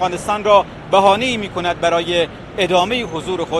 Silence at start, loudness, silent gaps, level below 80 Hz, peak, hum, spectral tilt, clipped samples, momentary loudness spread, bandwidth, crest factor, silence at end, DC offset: 0 s; -16 LUFS; none; -44 dBFS; 0 dBFS; none; -4 dB/octave; under 0.1%; 8 LU; 12.5 kHz; 16 dB; 0 s; under 0.1%